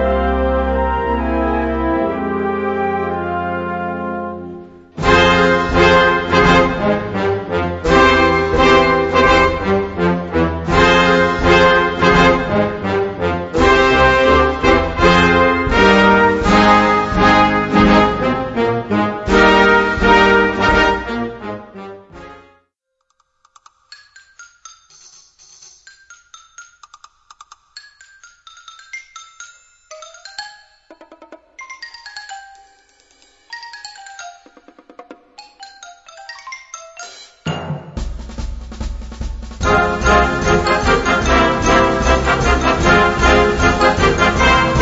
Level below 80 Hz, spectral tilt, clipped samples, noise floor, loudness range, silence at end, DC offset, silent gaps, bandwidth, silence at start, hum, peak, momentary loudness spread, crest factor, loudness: -28 dBFS; -5 dB/octave; under 0.1%; -69 dBFS; 23 LU; 0 s; under 0.1%; none; 8 kHz; 0 s; none; 0 dBFS; 21 LU; 16 dB; -13 LUFS